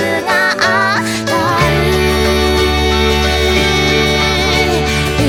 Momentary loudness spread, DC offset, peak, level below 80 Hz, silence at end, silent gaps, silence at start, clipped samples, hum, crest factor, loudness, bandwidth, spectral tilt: 2 LU; under 0.1%; 0 dBFS; -22 dBFS; 0 s; none; 0 s; under 0.1%; none; 12 dB; -12 LUFS; 17.5 kHz; -4.5 dB/octave